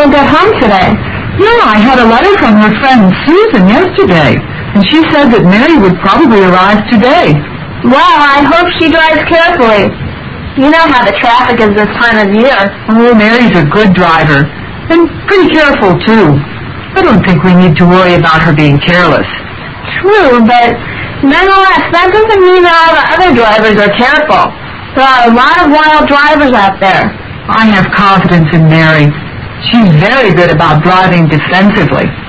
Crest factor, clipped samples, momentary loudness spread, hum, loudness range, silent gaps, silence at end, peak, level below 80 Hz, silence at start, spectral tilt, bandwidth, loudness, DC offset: 6 dB; 4%; 8 LU; none; 2 LU; none; 0 s; 0 dBFS; -28 dBFS; 0 s; -7 dB/octave; 8 kHz; -5 LUFS; under 0.1%